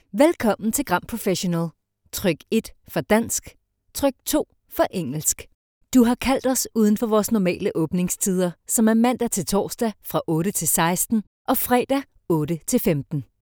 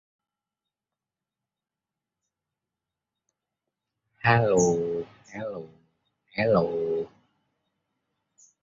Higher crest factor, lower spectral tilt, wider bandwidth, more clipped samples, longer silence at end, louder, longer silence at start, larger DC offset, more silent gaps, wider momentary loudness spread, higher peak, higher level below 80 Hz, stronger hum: about the same, 20 dB vs 24 dB; about the same, -4.5 dB/octave vs -5.5 dB/octave; first, over 20 kHz vs 7.6 kHz; neither; second, 0.25 s vs 1.55 s; first, -22 LUFS vs -25 LUFS; second, 0.15 s vs 4.25 s; neither; first, 5.54-5.81 s, 11.27-11.45 s vs none; second, 7 LU vs 17 LU; first, -2 dBFS vs -6 dBFS; first, -50 dBFS vs -60 dBFS; neither